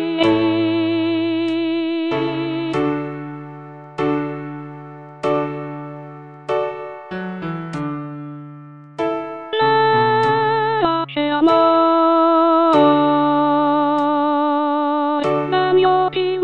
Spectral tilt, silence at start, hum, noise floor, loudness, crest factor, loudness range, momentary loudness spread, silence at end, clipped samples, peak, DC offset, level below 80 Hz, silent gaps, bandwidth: -7.5 dB/octave; 0 s; none; -38 dBFS; -18 LUFS; 16 dB; 11 LU; 19 LU; 0 s; under 0.1%; -2 dBFS; under 0.1%; -56 dBFS; none; 8.6 kHz